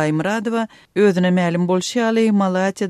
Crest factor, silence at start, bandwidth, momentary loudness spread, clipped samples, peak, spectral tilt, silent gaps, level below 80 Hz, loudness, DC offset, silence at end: 14 dB; 0 s; 12.5 kHz; 6 LU; under 0.1%; -4 dBFS; -6 dB/octave; none; -64 dBFS; -18 LUFS; under 0.1%; 0 s